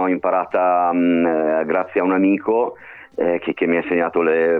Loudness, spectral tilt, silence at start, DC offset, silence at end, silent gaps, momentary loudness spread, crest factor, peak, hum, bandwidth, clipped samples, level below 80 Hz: -18 LUFS; -9.5 dB/octave; 0 s; under 0.1%; 0 s; none; 4 LU; 10 dB; -8 dBFS; none; 4 kHz; under 0.1%; -60 dBFS